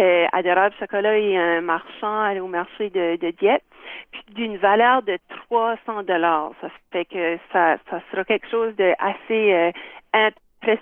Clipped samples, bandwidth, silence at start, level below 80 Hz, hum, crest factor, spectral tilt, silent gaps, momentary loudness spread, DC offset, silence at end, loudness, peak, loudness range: under 0.1%; 3.9 kHz; 0 s; -66 dBFS; none; 16 dB; -8 dB/octave; none; 11 LU; under 0.1%; 0 s; -21 LUFS; -4 dBFS; 2 LU